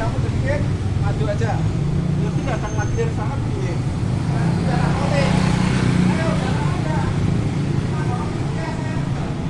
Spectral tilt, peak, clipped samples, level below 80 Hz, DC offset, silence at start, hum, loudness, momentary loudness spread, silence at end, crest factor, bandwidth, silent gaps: -7 dB/octave; -6 dBFS; under 0.1%; -32 dBFS; under 0.1%; 0 s; none; -21 LUFS; 5 LU; 0 s; 14 dB; 11.5 kHz; none